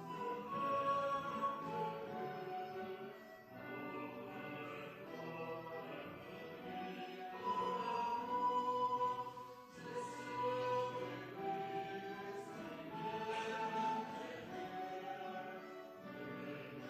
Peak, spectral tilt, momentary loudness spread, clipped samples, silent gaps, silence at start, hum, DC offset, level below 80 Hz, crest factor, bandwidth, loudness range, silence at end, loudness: -28 dBFS; -5.5 dB/octave; 12 LU; under 0.1%; none; 0 s; none; under 0.1%; -80 dBFS; 16 dB; 15.5 kHz; 8 LU; 0 s; -43 LUFS